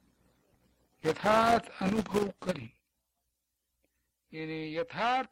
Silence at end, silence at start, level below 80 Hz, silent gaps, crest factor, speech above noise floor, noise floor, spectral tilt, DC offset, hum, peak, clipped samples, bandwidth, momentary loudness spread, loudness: 0.05 s; 1.05 s; -60 dBFS; none; 18 dB; 53 dB; -83 dBFS; -5.5 dB/octave; under 0.1%; none; -14 dBFS; under 0.1%; 16.5 kHz; 15 LU; -31 LUFS